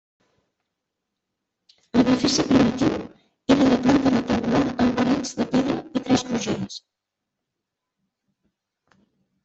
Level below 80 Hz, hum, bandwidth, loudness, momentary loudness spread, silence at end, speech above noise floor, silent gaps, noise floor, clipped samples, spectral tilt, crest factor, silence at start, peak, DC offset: -52 dBFS; none; 8.2 kHz; -21 LUFS; 11 LU; 2.65 s; 63 dB; none; -83 dBFS; under 0.1%; -5 dB/octave; 20 dB; 1.95 s; -4 dBFS; under 0.1%